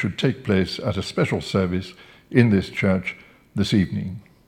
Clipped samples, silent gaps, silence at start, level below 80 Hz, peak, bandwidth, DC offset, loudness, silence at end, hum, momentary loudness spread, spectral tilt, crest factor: under 0.1%; none; 0 s; -50 dBFS; 0 dBFS; 12.5 kHz; under 0.1%; -22 LUFS; 0.3 s; none; 13 LU; -6.5 dB/octave; 22 dB